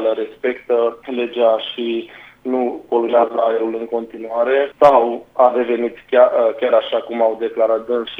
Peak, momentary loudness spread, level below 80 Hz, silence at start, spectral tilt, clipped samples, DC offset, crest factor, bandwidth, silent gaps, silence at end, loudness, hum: 0 dBFS; 11 LU; -60 dBFS; 0 s; -6 dB/octave; under 0.1%; under 0.1%; 16 dB; 5.8 kHz; none; 0 s; -17 LUFS; none